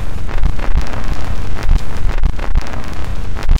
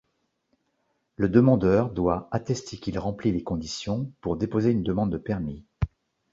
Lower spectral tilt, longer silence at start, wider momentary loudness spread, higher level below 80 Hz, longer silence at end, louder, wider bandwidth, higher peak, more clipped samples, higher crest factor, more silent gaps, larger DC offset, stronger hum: second, -6 dB/octave vs -7.5 dB/octave; second, 0 s vs 1.2 s; second, 5 LU vs 13 LU; first, -14 dBFS vs -44 dBFS; second, 0 s vs 0.45 s; first, -22 LUFS vs -26 LUFS; about the same, 7.8 kHz vs 7.8 kHz; first, -2 dBFS vs -6 dBFS; neither; second, 12 dB vs 20 dB; neither; first, 30% vs under 0.1%; neither